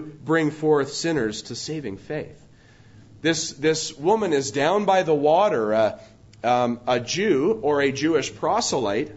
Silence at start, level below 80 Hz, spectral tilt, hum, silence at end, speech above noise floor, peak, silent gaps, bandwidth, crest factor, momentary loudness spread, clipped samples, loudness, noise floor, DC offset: 0 s; -58 dBFS; -4 dB/octave; none; 0 s; 29 dB; -6 dBFS; none; 8 kHz; 16 dB; 11 LU; under 0.1%; -22 LUFS; -51 dBFS; under 0.1%